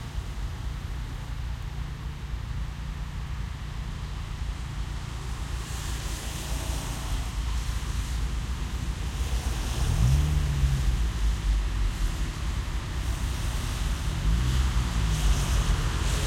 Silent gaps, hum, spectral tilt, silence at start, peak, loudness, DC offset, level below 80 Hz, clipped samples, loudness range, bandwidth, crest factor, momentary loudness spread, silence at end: none; none; -4.5 dB/octave; 0 s; -12 dBFS; -31 LUFS; under 0.1%; -30 dBFS; under 0.1%; 8 LU; 16 kHz; 16 dB; 10 LU; 0 s